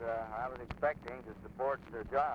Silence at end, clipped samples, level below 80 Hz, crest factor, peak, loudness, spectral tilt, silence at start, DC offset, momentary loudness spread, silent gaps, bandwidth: 0 s; under 0.1%; -56 dBFS; 18 dB; -20 dBFS; -39 LUFS; -7.5 dB/octave; 0 s; under 0.1%; 10 LU; none; 7.2 kHz